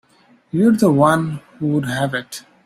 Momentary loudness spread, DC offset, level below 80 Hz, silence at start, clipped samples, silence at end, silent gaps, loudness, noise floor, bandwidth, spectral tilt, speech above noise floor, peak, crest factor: 13 LU; under 0.1%; -56 dBFS; 0.55 s; under 0.1%; 0.25 s; none; -18 LUFS; -54 dBFS; 15.5 kHz; -6.5 dB/octave; 37 dB; -2 dBFS; 16 dB